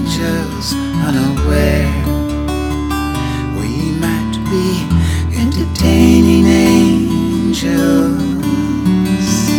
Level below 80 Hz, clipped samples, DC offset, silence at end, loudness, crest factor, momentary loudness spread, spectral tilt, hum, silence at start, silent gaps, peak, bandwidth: -24 dBFS; 0.1%; under 0.1%; 0 s; -14 LUFS; 12 dB; 9 LU; -6 dB/octave; none; 0 s; none; 0 dBFS; 19 kHz